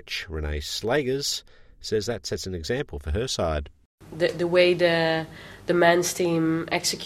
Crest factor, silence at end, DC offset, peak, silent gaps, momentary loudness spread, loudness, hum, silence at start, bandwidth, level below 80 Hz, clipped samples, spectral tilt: 22 dB; 0 s; under 0.1%; -4 dBFS; 3.85-3.98 s; 12 LU; -25 LUFS; none; 0.05 s; 16 kHz; -42 dBFS; under 0.1%; -4 dB/octave